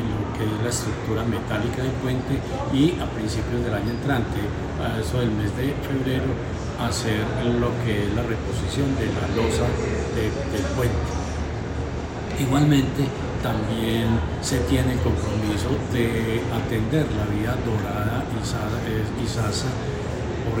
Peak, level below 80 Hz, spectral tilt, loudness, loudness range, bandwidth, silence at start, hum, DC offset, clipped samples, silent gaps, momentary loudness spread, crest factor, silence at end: -8 dBFS; -36 dBFS; -6 dB/octave; -24 LUFS; 2 LU; 16.5 kHz; 0 s; none; under 0.1%; under 0.1%; none; 5 LU; 16 dB; 0 s